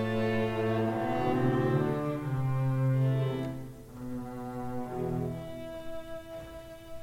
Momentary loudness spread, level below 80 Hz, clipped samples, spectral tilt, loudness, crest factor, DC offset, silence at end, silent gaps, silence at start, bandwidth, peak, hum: 15 LU; -54 dBFS; under 0.1%; -8.5 dB/octave; -31 LUFS; 14 dB; under 0.1%; 0 s; none; 0 s; 15.5 kHz; -16 dBFS; none